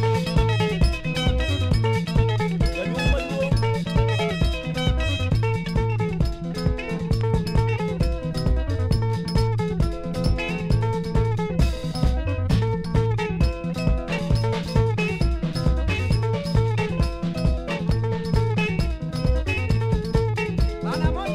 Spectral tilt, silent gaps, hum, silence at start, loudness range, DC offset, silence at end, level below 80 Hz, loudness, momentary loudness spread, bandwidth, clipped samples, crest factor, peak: -7 dB/octave; none; none; 0 s; 2 LU; under 0.1%; 0 s; -28 dBFS; -24 LUFS; 4 LU; 13 kHz; under 0.1%; 16 dB; -6 dBFS